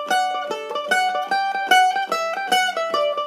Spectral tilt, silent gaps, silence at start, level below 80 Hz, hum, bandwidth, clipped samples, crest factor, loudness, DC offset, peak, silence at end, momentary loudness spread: -0.5 dB/octave; none; 0 s; -82 dBFS; none; 15.5 kHz; under 0.1%; 18 dB; -20 LUFS; under 0.1%; -2 dBFS; 0 s; 8 LU